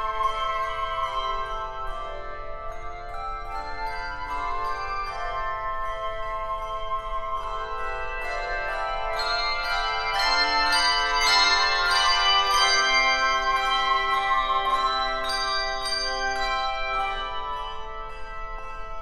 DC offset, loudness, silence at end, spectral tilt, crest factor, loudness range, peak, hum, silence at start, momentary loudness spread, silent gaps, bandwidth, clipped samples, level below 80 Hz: under 0.1%; -24 LUFS; 0 s; -0.5 dB/octave; 18 dB; 12 LU; -8 dBFS; none; 0 s; 16 LU; none; 15 kHz; under 0.1%; -38 dBFS